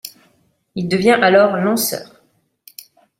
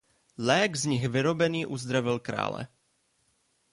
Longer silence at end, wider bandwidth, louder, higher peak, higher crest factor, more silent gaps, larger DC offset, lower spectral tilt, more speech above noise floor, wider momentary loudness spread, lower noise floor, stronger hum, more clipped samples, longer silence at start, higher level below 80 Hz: about the same, 1.15 s vs 1.05 s; first, 16.5 kHz vs 11.5 kHz; first, -15 LUFS vs -28 LUFS; first, -2 dBFS vs -10 dBFS; about the same, 16 dB vs 20 dB; neither; neither; about the same, -4.5 dB/octave vs -4.5 dB/octave; about the same, 46 dB vs 44 dB; first, 18 LU vs 8 LU; second, -60 dBFS vs -72 dBFS; neither; neither; second, 0.05 s vs 0.4 s; about the same, -60 dBFS vs -64 dBFS